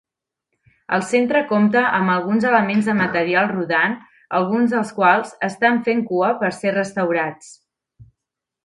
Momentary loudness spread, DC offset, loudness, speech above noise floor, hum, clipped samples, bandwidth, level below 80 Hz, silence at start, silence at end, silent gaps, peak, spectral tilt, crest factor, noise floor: 6 LU; under 0.1%; -18 LUFS; 65 dB; none; under 0.1%; 11.5 kHz; -64 dBFS; 0.9 s; 0.6 s; none; -2 dBFS; -6 dB/octave; 18 dB; -83 dBFS